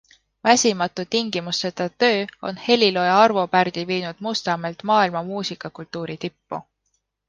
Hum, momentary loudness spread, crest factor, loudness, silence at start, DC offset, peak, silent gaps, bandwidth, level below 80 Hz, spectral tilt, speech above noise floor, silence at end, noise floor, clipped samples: none; 15 LU; 20 dB; -21 LUFS; 0.45 s; under 0.1%; -2 dBFS; none; 10.5 kHz; -66 dBFS; -3.5 dB/octave; 52 dB; 0.65 s; -73 dBFS; under 0.1%